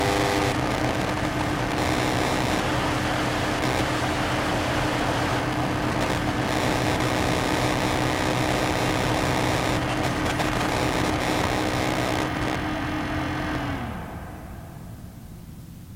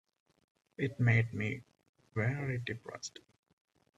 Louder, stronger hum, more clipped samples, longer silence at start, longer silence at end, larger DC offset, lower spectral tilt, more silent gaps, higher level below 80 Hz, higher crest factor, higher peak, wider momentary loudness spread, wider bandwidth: first, -24 LUFS vs -35 LUFS; neither; neither; second, 0 s vs 0.8 s; second, 0 s vs 0.9 s; neither; second, -5 dB/octave vs -6.5 dB/octave; second, none vs 1.89-1.93 s; first, -38 dBFS vs -68 dBFS; about the same, 16 dB vs 20 dB; first, -8 dBFS vs -16 dBFS; second, 13 LU vs 16 LU; first, 17 kHz vs 7.8 kHz